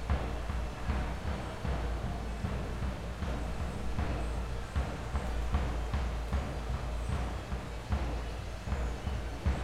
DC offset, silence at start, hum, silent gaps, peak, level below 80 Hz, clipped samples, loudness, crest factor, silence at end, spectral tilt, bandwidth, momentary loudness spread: under 0.1%; 0 s; none; none; -18 dBFS; -36 dBFS; under 0.1%; -37 LUFS; 16 dB; 0 s; -6.5 dB/octave; 12.5 kHz; 3 LU